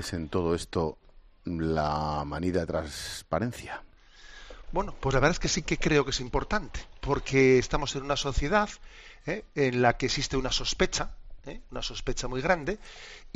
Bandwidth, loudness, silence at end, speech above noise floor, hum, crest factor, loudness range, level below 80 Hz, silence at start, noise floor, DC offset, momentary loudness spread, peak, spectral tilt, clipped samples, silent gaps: 13 kHz; -29 LUFS; 0.05 s; 22 dB; none; 22 dB; 5 LU; -40 dBFS; 0 s; -50 dBFS; under 0.1%; 16 LU; -8 dBFS; -4.5 dB/octave; under 0.1%; none